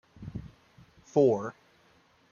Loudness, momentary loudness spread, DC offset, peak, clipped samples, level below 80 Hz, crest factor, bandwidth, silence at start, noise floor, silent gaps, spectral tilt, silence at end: -27 LUFS; 19 LU; under 0.1%; -10 dBFS; under 0.1%; -60 dBFS; 22 dB; 7.2 kHz; 0.2 s; -64 dBFS; none; -8 dB/octave; 0.8 s